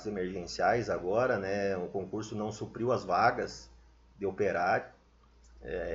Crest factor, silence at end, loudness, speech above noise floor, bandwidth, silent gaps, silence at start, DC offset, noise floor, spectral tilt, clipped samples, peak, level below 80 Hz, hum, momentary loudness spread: 20 dB; 0 s; -32 LUFS; 30 dB; 7.8 kHz; none; 0 s; under 0.1%; -61 dBFS; -5.5 dB/octave; under 0.1%; -12 dBFS; -58 dBFS; none; 11 LU